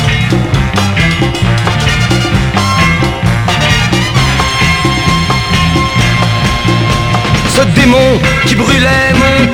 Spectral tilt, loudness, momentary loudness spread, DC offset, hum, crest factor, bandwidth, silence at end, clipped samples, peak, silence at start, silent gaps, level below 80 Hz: -5 dB/octave; -9 LUFS; 4 LU; under 0.1%; none; 10 dB; 17.5 kHz; 0 s; 0.4%; 0 dBFS; 0 s; none; -22 dBFS